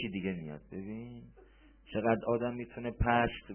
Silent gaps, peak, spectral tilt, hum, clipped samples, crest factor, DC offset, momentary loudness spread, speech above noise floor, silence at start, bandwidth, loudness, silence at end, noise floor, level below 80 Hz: none; -14 dBFS; -5 dB/octave; none; under 0.1%; 20 dB; under 0.1%; 15 LU; 25 dB; 0 s; 3.3 kHz; -34 LUFS; 0 s; -59 dBFS; -48 dBFS